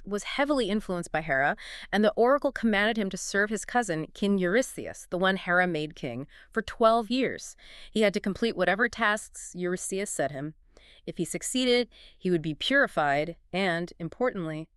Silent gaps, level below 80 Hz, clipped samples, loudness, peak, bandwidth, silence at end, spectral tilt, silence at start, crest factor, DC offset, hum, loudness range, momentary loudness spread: none; -54 dBFS; under 0.1%; -27 LUFS; -8 dBFS; 13.5 kHz; 0.1 s; -4 dB/octave; 0 s; 20 dB; under 0.1%; none; 3 LU; 13 LU